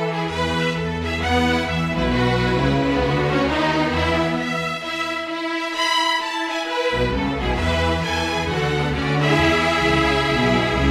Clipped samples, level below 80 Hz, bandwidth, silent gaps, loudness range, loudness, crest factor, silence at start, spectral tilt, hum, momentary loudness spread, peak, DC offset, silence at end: under 0.1%; -34 dBFS; 15.5 kHz; none; 2 LU; -20 LUFS; 14 dB; 0 s; -5 dB/octave; none; 6 LU; -6 dBFS; under 0.1%; 0 s